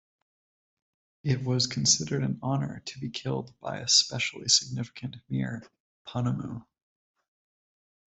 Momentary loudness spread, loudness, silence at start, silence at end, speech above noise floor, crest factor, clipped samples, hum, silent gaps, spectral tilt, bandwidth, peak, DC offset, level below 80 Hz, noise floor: 16 LU; -27 LUFS; 1.25 s; 1.55 s; over 61 dB; 24 dB; under 0.1%; none; 5.80-6.05 s; -3 dB/octave; 8.2 kHz; -6 dBFS; under 0.1%; -64 dBFS; under -90 dBFS